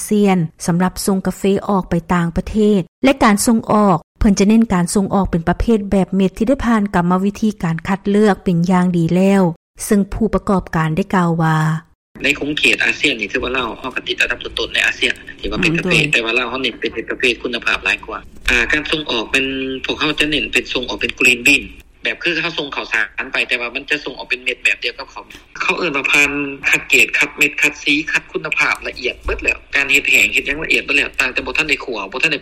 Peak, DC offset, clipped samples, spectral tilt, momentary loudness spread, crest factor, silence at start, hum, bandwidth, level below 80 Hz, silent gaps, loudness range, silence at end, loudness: -2 dBFS; under 0.1%; under 0.1%; -4.5 dB/octave; 8 LU; 14 dB; 0 s; none; 16.5 kHz; -36 dBFS; 2.88-3.02 s, 4.03-4.15 s, 9.56-9.74 s, 11.95-12.15 s; 3 LU; 0 s; -16 LUFS